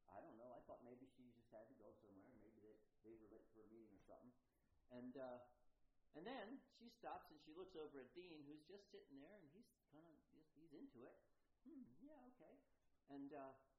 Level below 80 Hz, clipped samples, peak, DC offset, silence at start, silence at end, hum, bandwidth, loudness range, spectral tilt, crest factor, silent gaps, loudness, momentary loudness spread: -86 dBFS; under 0.1%; -42 dBFS; under 0.1%; 0 s; 0 s; none; 5.4 kHz; 8 LU; -4 dB/octave; 20 dB; none; -62 LUFS; 12 LU